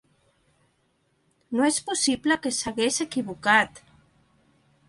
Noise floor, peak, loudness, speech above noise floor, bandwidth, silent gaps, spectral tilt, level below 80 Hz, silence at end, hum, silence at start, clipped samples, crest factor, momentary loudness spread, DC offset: -69 dBFS; -6 dBFS; -24 LUFS; 45 dB; 11.5 kHz; none; -2 dB/octave; -62 dBFS; 1.1 s; none; 1.5 s; under 0.1%; 22 dB; 8 LU; under 0.1%